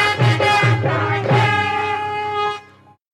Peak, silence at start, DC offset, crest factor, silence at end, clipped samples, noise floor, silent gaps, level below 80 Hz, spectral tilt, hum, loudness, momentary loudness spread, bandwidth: -4 dBFS; 0 s; under 0.1%; 14 dB; 0.5 s; under 0.1%; -46 dBFS; none; -52 dBFS; -5.5 dB/octave; none; -17 LUFS; 8 LU; 11.5 kHz